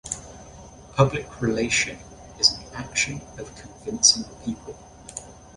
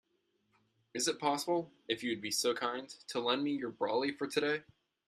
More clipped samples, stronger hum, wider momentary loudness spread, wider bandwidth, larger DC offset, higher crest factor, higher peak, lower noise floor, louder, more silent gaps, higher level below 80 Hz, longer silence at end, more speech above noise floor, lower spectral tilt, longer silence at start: neither; neither; first, 23 LU vs 6 LU; second, 11.5 kHz vs 15 kHz; neither; about the same, 24 dB vs 20 dB; first, -2 dBFS vs -16 dBFS; second, -44 dBFS vs -78 dBFS; first, -22 LUFS vs -35 LUFS; neither; first, -48 dBFS vs -80 dBFS; second, 0.1 s vs 0.45 s; second, 20 dB vs 43 dB; about the same, -2.5 dB/octave vs -2.5 dB/octave; second, 0.05 s vs 0.95 s